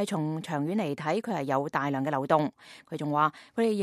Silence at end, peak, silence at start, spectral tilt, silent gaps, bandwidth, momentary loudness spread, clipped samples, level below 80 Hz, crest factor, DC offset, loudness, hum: 0 s; -8 dBFS; 0 s; -6.5 dB/octave; none; 14.5 kHz; 5 LU; under 0.1%; -76 dBFS; 20 dB; under 0.1%; -29 LUFS; none